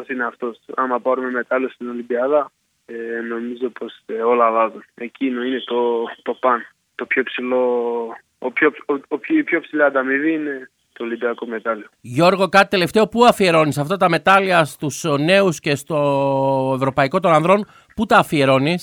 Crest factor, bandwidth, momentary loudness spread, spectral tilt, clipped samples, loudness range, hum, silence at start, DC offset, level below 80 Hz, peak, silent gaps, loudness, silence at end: 18 dB; 18 kHz; 14 LU; -5.5 dB/octave; under 0.1%; 7 LU; none; 0 s; under 0.1%; -58 dBFS; 0 dBFS; none; -18 LUFS; 0 s